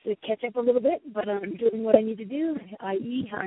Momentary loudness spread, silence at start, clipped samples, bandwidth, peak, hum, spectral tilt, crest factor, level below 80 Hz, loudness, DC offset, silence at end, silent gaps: 9 LU; 0.05 s; under 0.1%; 4 kHz; -2 dBFS; none; -10.5 dB/octave; 24 dB; -68 dBFS; -27 LUFS; under 0.1%; 0 s; none